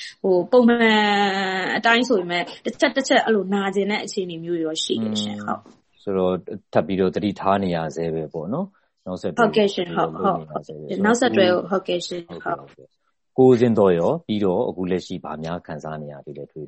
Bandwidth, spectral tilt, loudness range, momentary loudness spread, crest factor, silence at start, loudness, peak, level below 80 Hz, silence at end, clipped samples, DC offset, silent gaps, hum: 8.4 kHz; -5 dB/octave; 5 LU; 15 LU; 18 dB; 0 s; -21 LUFS; -2 dBFS; -60 dBFS; 0 s; under 0.1%; under 0.1%; none; none